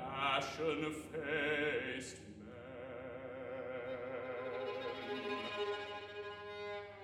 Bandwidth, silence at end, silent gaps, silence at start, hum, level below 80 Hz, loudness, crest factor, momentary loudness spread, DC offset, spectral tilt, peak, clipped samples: 13.5 kHz; 0 s; none; 0 s; none; -70 dBFS; -41 LUFS; 20 dB; 13 LU; under 0.1%; -4 dB/octave; -22 dBFS; under 0.1%